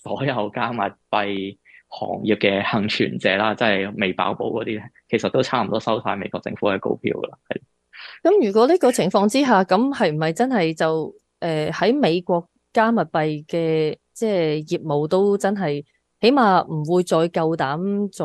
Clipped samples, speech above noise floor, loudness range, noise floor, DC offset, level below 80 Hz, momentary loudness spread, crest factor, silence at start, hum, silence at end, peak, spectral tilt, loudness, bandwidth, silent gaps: under 0.1%; 22 dB; 4 LU; -42 dBFS; under 0.1%; -64 dBFS; 11 LU; 18 dB; 0.05 s; none; 0 s; -2 dBFS; -5.5 dB/octave; -21 LUFS; 12.5 kHz; none